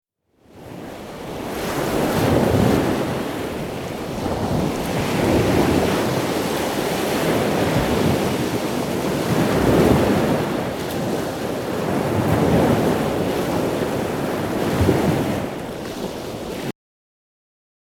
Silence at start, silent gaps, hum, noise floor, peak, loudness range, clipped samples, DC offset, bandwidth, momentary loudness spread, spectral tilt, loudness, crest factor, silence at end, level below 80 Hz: 0.55 s; none; none; -55 dBFS; -4 dBFS; 3 LU; under 0.1%; under 0.1%; 19.5 kHz; 11 LU; -6 dB/octave; -21 LUFS; 18 dB; 1.15 s; -38 dBFS